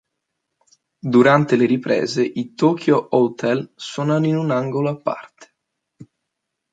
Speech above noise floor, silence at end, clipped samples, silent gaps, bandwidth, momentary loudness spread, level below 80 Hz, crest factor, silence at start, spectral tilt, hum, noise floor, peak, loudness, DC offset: 61 dB; 1.3 s; under 0.1%; none; 9.2 kHz; 11 LU; -66 dBFS; 18 dB; 1.05 s; -7 dB/octave; none; -79 dBFS; -2 dBFS; -18 LUFS; under 0.1%